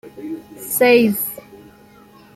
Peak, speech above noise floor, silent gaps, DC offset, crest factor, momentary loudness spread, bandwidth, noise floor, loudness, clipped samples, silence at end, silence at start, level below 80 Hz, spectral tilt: -2 dBFS; 30 dB; none; under 0.1%; 18 dB; 19 LU; 15.5 kHz; -46 dBFS; -16 LUFS; under 0.1%; 0.95 s; 0.05 s; -62 dBFS; -4 dB/octave